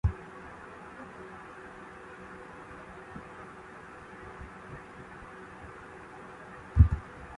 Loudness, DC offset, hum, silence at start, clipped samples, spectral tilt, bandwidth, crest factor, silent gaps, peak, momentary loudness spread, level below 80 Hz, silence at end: -36 LUFS; under 0.1%; none; 0.05 s; under 0.1%; -8 dB/octave; 9.6 kHz; 26 dB; none; -8 dBFS; 18 LU; -38 dBFS; 0 s